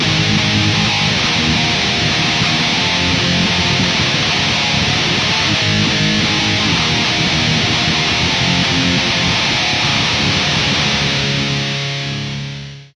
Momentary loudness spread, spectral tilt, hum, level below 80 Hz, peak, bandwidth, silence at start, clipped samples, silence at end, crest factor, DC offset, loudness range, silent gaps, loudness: 3 LU; -3.5 dB/octave; none; -36 dBFS; -2 dBFS; 10.5 kHz; 0 s; under 0.1%; 0.1 s; 14 dB; under 0.1%; 1 LU; none; -13 LUFS